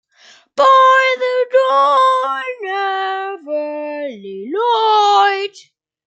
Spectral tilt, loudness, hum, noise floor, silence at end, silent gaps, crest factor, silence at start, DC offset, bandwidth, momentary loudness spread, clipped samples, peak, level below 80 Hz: -2 dB/octave; -14 LUFS; none; -48 dBFS; 0.45 s; none; 14 dB; 0.55 s; under 0.1%; 8.8 kHz; 14 LU; under 0.1%; -2 dBFS; -78 dBFS